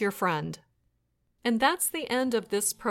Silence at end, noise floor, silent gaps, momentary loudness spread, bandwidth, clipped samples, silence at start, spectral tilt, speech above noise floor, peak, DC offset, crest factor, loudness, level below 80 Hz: 0 s; -74 dBFS; none; 9 LU; 17 kHz; under 0.1%; 0 s; -3 dB/octave; 46 dB; -10 dBFS; under 0.1%; 20 dB; -28 LUFS; -66 dBFS